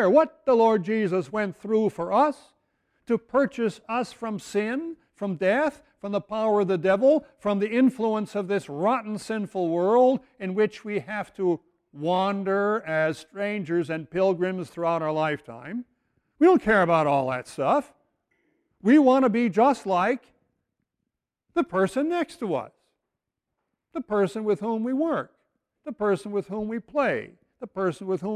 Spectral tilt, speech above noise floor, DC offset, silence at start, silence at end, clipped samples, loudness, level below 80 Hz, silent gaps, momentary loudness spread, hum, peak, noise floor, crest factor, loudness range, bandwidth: -7 dB/octave; 60 dB; under 0.1%; 0 s; 0 s; under 0.1%; -25 LUFS; -64 dBFS; none; 12 LU; none; -8 dBFS; -84 dBFS; 18 dB; 6 LU; 12.5 kHz